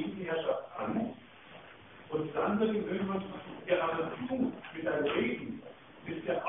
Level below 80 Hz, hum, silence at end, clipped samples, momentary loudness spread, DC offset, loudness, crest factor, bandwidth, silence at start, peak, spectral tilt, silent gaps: -68 dBFS; none; 0 s; under 0.1%; 21 LU; under 0.1%; -34 LUFS; 18 dB; 3.8 kHz; 0 s; -16 dBFS; -9.5 dB/octave; none